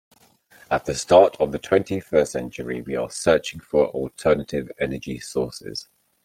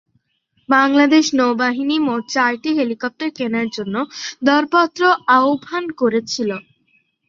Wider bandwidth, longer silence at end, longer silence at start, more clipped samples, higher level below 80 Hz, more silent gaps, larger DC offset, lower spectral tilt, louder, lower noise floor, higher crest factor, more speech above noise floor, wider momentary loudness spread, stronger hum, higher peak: first, 16 kHz vs 7.6 kHz; second, 0.45 s vs 0.7 s; about the same, 0.7 s vs 0.7 s; neither; first, -50 dBFS vs -64 dBFS; neither; neither; first, -5 dB/octave vs -3.5 dB/octave; second, -22 LUFS vs -17 LUFS; second, -55 dBFS vs -65 dBFS; about the same, 20 dB vs 16 dB; second, 33 dB vs 48 dB; first, 14 LU vs 10 LU; neither; about the same, -2 dBFS vs -2 dBFS